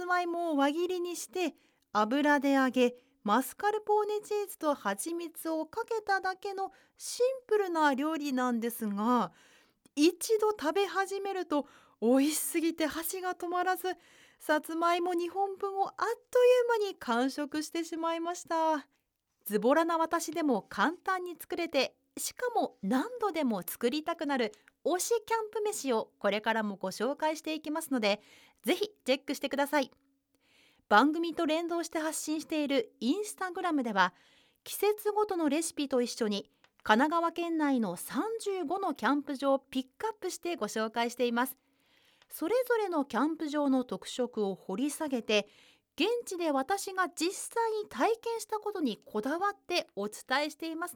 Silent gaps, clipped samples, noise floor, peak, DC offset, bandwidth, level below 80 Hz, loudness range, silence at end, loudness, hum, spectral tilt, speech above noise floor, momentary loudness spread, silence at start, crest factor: none; under 0.1%; -78 dBFS; -10 dBFS; under 0.1%; over 20 kHz; -76 dBFS; 3 LU; 0 s; -31 LUFS; none; -3.5 dB/octave; 47 dB; 9 LU; 0 s; 22 dB